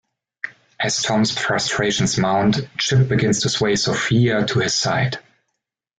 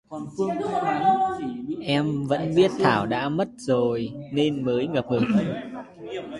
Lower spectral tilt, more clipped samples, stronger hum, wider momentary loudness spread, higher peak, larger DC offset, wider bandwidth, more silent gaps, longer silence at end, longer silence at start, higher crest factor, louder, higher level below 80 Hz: second, -4 dB/octave vs -6.5 dB/octave; neither; neither; about the same, 8 LU vs 10 LU; second, -6 dBFS vs -2 dBFS; neither; second, 9.4 kHz vs 11.5 kHz; neither; first, 0.8 s vs 0 s; first, 0.45 s vs 0.1 s; second, 14 dB vs 22 dB; first, -19 LUFS vs -24 LUFS; first, -50 dBFS vs -58 dBFS